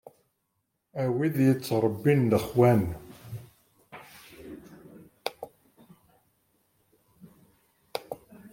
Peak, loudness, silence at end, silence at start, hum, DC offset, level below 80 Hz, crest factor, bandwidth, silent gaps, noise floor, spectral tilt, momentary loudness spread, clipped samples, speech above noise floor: -8 dBFS; -26 LUFS; 0.05 s; 0.95 s; none; under 0.1%; -60 dBFS; 22 dB; 16.5 kHz; none; -79 dBFS; -7.5 dB/octave; 25 LU; under 0.1%; 55 dB